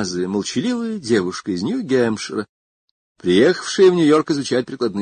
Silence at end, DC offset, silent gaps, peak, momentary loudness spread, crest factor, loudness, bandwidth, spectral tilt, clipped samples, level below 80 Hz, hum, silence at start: 0 s; under 0.1%; 2.49-3.15 s; -2 dBFS; 10 LU; 16 dB; -18 LUFS; 9.6 kHz; -5 dB/octave; under 0.1%; -56 dBFS; none; 0 s